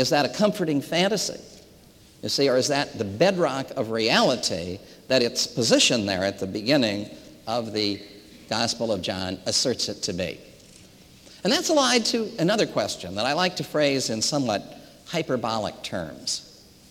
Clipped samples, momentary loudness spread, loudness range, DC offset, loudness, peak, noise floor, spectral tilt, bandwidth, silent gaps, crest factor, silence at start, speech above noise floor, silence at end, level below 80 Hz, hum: under 0.1%; 11 LU; 4 LU; under 0.1%; -24 LUFS; -6 dBFS; -52 dBFS; -3.5 dB/octave; 17 kHz; none; 20 dB; 0 s; 28 dB; 0.4 s; -62 dBFS; none